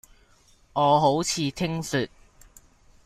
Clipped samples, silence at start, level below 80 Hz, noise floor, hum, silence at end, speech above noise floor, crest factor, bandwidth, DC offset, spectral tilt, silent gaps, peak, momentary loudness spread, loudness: under 0.1%; 0.75 s; -54 dBFS; -58 dBFS; none; 1 s; 35 dB; 18 dB; 16 kHz; under 0.1%; -4.5 dB/octave; none; -8 dBFS; 11 LU; -24 LUFS